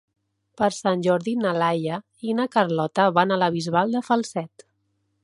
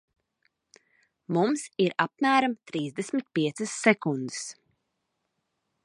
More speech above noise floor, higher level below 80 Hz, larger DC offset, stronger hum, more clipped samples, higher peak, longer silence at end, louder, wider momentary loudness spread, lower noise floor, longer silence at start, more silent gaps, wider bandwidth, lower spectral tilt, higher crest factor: second, 49 dB vs 53 dB; first, -68 dBFS vs -78 dBFS; neither; neither; neither; about the same, -4 dBFS vs -4 dBFS; second, 0.75 s vs 1.35 s; first, -23 LUFS vs -27 LUFS; about the same, 10 LU vs 10 LU; second, -72 dBFS vs -80 dBFS; second, 0.6 s vs 1.3 s; neither; about the same, 11.5 kHz vs 11.5 kHz; about the same, -5.5 dB/octave vs -4.5 dB/octave; about the same, 20 dB vs 24 dB